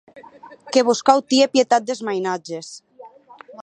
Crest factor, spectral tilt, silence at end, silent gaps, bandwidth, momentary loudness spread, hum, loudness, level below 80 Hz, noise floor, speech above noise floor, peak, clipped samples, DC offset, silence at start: 20 dB; -3 dB/octave; 0 s; none; 10.5 kHz; 16 LU; none; -18 LUFS; -70 dBFS; -45 dBFS; 25 dB; 0 dBFS; under 0.1%; under 0.1%; 0.15 s